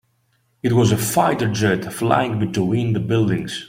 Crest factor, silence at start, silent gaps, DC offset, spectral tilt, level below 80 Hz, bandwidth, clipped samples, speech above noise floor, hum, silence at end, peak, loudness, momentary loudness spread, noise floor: 18 dB; 0.65 s; none; under 0.1%; -5.5 dB/octave; -50 dBFS; 16.5 kHz; under 0.1%; 46 dB; none; 0 s; -2 dBFS; -19 LUFS; 4 LU; -64 dBFS